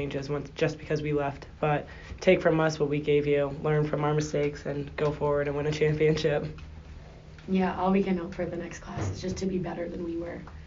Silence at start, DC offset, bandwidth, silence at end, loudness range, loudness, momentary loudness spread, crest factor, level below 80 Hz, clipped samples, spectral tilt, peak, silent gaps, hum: 0 s; under 0.1%; 7.4 kHz; 0 s; 4 LU; -28 LUFS; 13 LU; 20 dB; -48 dBFS; under 0.1%; -6 dB/octave; -8 dBFS; none; none